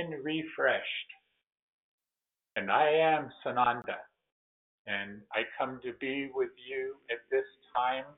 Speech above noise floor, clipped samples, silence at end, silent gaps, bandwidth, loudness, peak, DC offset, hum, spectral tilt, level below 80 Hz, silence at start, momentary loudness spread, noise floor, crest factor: over 58 dB; under 0.1%; 0.05 s; 1.59-1.98 s, 4.32-4.85 s; 4 kHz; -32 LUFS; -12 dBFS; under 0.1%; none; -1.5 dB/octave; -76 dBFS; 0 s; 12 LU; under -90 dBFS; 20 dB